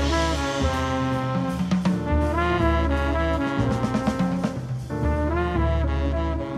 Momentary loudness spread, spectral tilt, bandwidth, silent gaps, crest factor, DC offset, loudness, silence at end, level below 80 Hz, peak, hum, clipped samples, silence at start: 4 LU; -6.5 dB/octave; 12 kHz; none; 14 dB; under 0.1%; -24 LUFS; 0 s; -30 dBFS; -10 dBFS; none; under 0.1%; 0 s